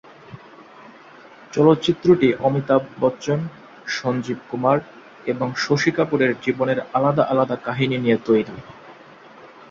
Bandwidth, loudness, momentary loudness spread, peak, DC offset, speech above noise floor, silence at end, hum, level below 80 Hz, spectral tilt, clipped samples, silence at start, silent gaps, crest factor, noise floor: 7.6 kHz; -20 LUFS; 12 LU; -2 dBFS; under 0.1%; 25 dB; 0.05 s; none; -58 dBFS; -6.5 dB/octave; under 0.1%; 0.3 s; none; 18 dB; -45 dBFS